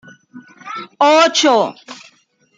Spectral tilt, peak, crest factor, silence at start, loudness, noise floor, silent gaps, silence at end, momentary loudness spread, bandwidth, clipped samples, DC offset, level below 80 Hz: -2 dB/octave; -2 dBFS; 16 dB; 0.35 s; -13 LUFS; -55 dBFS; none; 0.65 s; 23 LU; 9.4 kHz; under 0.1%; under 0.1%; -72 dBFS